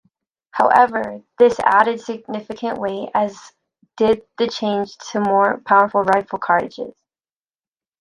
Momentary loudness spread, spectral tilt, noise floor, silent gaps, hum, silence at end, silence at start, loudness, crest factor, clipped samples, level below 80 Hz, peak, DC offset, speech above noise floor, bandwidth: 14 LU; -5 dB/octave; under -90 dBFS; none; none; 1.1 s; 0.55 s; -18 LUFS; 18 dB; under 0.1%; -60 dBFS; 0 dBFS; under 0.1%; over 72 dB; 11 kHz